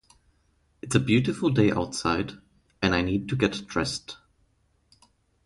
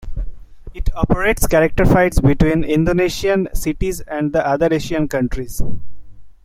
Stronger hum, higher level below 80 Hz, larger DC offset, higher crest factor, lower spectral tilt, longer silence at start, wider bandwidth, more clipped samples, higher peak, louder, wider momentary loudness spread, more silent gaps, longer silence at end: neither; second, -48 dBFS vs -26 dBFS; neither; first, 22 dB vs 16 dB; about the same, -5.5 dB/octave vs -6 dB/octave; first, 0.85 s vs 0 s; second, 11.5 kHz vs 16 kHz; neither; second, -6 dBFS vs 0 dBFS; second, -26 LUFS vs -17 LUFS; about the same, 13 LU vs 14 LU; neither; first, 1.3 s vs 0.15 s